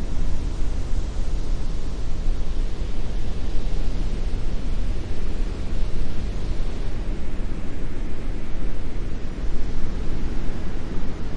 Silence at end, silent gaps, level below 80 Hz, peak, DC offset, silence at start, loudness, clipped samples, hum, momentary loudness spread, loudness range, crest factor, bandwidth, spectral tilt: 0 s; none; -24 dBFS; -6 dBFS; under 0.1%; 0 s; -31 LUFS; under 0.1%; none; 3 LU; 2 LU; 12 dB; 6.6 kHz; -6.5 dB/octave